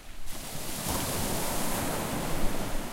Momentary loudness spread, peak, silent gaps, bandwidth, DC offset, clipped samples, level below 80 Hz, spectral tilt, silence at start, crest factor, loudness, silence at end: 8 LU; -12 dBFS; none; 16 kHz; under 0.1%; under 0.1%; -36 dBFS; -3.5 dB/octave; 0 s; 16 dB; -32 LUFS; 0 s